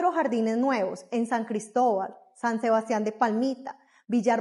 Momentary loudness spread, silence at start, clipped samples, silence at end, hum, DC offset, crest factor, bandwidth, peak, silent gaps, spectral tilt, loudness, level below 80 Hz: 6 LU; 0 s; under 0.1%; 0 s; none; under 0.1%; 16 dB; 11.5 kHz; -10 dBFS; none; -5.5 dB/octave; -27 LUFS; -86 dBFS